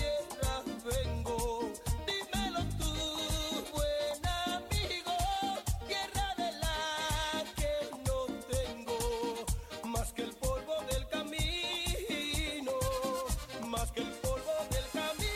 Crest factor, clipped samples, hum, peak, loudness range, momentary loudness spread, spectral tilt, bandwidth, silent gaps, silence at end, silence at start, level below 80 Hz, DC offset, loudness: 14 dB; under 0.1%; none; -20 dBFS; 2 LU; 4 LU; -3.5 dB/octave; 16.5 kHz; none; 0 s; 0 s; -42 dBFS; under 0.1%; -35 LUFS